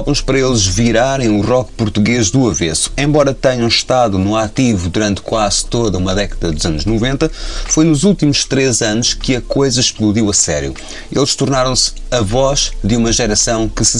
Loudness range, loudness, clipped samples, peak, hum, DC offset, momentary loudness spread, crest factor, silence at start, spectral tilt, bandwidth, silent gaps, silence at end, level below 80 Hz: 2 LU; -13 LUFS; under 0.1%; 0 dBFS; none; 1%; 5 LU; 14 dB; 0 s; -4 dB/octave; 11.5 kHz; none; 0 s; -26 dBFS